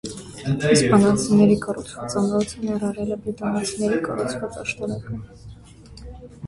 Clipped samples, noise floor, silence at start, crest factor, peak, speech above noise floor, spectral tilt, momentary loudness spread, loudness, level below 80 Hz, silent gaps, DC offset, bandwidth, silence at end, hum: under 0.1%; -43 dBFS; 0.05 s; 18 dB; -4 dBFS; 22 dB; -5.5 dB/octave; 18 LU; -22 LUFS; -48 dBFS; none; under 0.1%; 11.5 kHz; 0 s; none